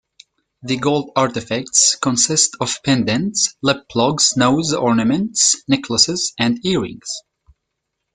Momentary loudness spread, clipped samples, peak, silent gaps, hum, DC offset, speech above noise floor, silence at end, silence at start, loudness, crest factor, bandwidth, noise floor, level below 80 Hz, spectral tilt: 8 LU; under 0.1%; 0 dBFS; none; none; under 0.1%; 59 dB; 0.95 s; 0.65 s; -16 LUFS; 18 dB; 10 kHz; -77 dBFS; -54 dBFS; -3 dB/octave